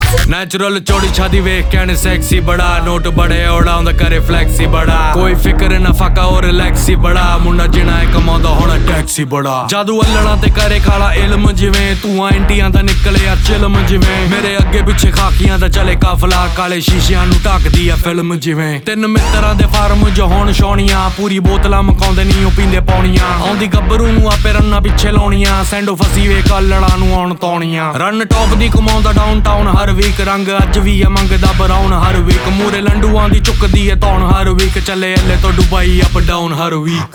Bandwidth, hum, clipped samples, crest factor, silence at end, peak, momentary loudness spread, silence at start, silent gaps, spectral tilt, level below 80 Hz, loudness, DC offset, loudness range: 20 kHz; none; under 0.1%; 8 dB; 0.05 s; 0 dBFS; 3 LU; 0 s; none; -5.5 dB/octave; -12 dBFS; -11 LUFS; under 0.1%; 1 LU